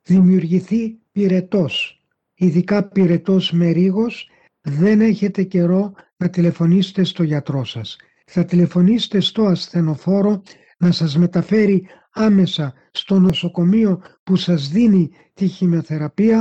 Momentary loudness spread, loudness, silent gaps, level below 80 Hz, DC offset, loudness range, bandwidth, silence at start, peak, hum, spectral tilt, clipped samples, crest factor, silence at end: 10 LU; -17 LUFS; 14.19-14.26 s; -54 dBFS; under 0.1%; 1 LU; 7.8 kHz; 0.1 s; -6 dBFS; none; -8 dB/octave; under 0.1%; 10 dB; 0 s